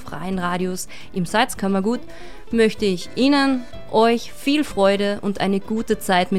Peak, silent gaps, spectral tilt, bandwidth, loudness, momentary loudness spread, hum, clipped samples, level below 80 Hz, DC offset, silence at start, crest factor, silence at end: -4 dBFS; none; -5 dB/octave; 15.5 kHz; -21 LUFS; 10 LU; none; under 0.1%; -46 dBFS; 2%; 0 s; 16 dB; 0 s